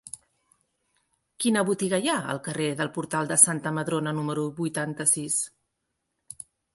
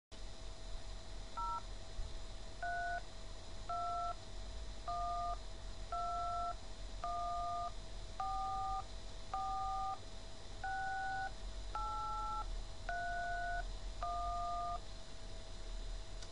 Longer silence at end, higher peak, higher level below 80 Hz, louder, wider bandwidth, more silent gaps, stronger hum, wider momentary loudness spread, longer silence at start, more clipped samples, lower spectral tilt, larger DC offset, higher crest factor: first, 0.4 s vs 0 s; first, 0 dBFS vs -28 dBFS; second, -70 dBFS vs -48 dBFS; first, -25 LUFS vs -44 LUFS; about the same, 12 kHz vs 11 kHz; neither; neither; first, 24 LU vs 12 LU; about the same, 0.05 s vs 0.1 s; neither; about the same, -3.5 dB/octave vs -3.5 dB/octave; second, under 0.1% vs 0.3%; first, 28 dB vs 14 dB